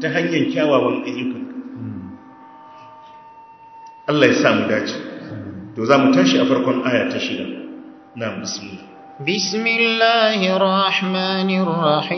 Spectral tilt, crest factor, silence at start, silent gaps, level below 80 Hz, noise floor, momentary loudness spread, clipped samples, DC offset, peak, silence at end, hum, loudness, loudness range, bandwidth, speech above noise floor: -5 dB/octave; 20 dB; 0 s; none; -60 dBFS; -43 dBFS; 18 LU; under 0.1%; under 0.1%; 0 dBFS; 0 s; none; -17 LUFS; 6 LU; 6.4 kHz; 25 dB